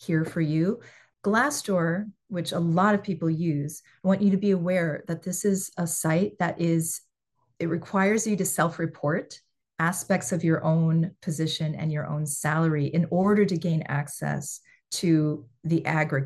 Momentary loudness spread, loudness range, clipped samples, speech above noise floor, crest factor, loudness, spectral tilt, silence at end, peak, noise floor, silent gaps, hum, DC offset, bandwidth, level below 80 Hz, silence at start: 9 LU; 2 LU; under 0.1%; 49 dB; 18 dB; -26 LUFS; -5.5 dB/octave; 0 s; -8 dBFS; -74 dBFS; none; none; under 0.1%; 12.5 kHz; -66 dBFS; 0 s